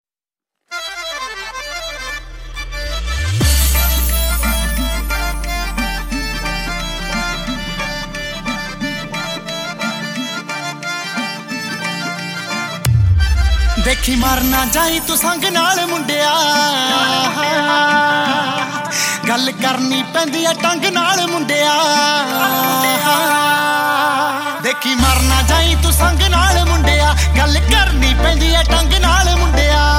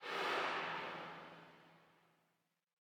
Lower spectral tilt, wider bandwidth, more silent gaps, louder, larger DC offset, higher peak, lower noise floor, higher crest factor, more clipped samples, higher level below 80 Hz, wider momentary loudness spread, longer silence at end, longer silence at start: about the same, -3.5 dB/octave vs -3 dB/octave; second, 17 kHz vs 19 kHz; neither; first, -15 LUFS vs -42 LUFS; neither; first, 0 dBFS vs -28 dBFS; first, under -90 dBFS vs -84 dBFS; about the same, 16 dB vs 18 dB; neither; first, -20 dBFS vs under -90 dBFS; second, 10 LU vs 20 LU; second, 0 s vs 1.1 s; first, 0.7 s vs 0 s